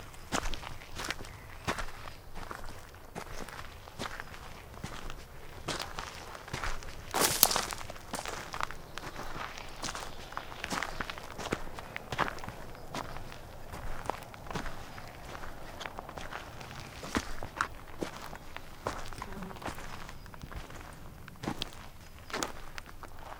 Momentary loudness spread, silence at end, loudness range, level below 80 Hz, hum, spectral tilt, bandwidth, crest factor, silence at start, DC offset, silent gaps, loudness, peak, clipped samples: 12 LU; 0 s; 11 LU; -46 dBFS; none; -2.5 dB/octave; 18 kHz; 38 dB; 0 s; under 0.1%; none; -38 LUFS; 0 dBFS; under 0.1%